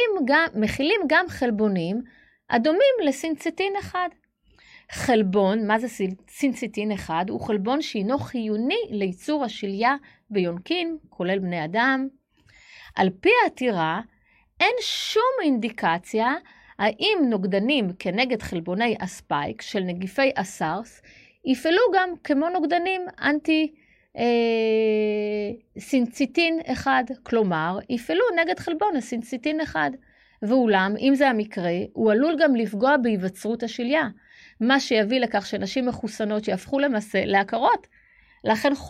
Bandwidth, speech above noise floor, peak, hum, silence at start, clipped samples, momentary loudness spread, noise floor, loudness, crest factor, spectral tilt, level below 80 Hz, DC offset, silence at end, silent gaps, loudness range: 15 kHz; 35 dB; -6 dBFS; none; 0 s; under 0.1%; 9 LU; -58 dBFS; -23 LUFS; 18 dB; -5 dB/octave; -58 dBFS; under 0.1%; 0 s; none; 4 LU